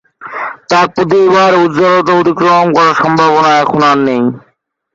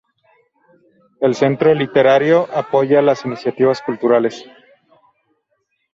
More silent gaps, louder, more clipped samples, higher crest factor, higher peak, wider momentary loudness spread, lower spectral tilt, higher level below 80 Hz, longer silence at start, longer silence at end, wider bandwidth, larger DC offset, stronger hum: neither; first, -9 LUFS vs -15 LUFS; neither; second, 10 dB vs 16 dB; about the same, 0 dBFS vs -2 dBFS; first, 12 LU vs 7 LU; about the same, -5.5 dB/octave vs -6.5 dB/octave; first, -52 dBFS vs -62 dBFS; second, 0.2 s vs 1.2 s; second, 0.55 s vs 1.5 s; about the same, 7.8 kHz vs 7.6 kHz; neither; neither